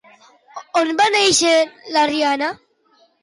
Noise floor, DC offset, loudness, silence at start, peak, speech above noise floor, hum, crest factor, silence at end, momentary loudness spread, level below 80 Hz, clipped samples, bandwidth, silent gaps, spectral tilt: -58 dBFS; under 0.1%; -16 LUFS; 0.55 s; -4 dBFS; 41 dB; none; 14 dB; 0.65 s; 12 LU; -62 dBFS; under 0.1%; 11.5 kHz; none; -1.5 dB/octave